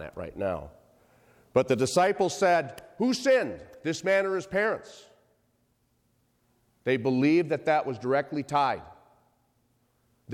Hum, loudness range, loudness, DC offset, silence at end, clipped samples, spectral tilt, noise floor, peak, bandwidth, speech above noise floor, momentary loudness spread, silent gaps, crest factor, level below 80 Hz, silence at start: none; 5 LU; -27 LUFS; under 0.1%; 0 s; under 0.1%; -5 dB/octave; -71 dBFS; -10 dBFS; 16 kHz; 44 dB; 12 LU; none; 20 dB; -62 dBFS; 0 s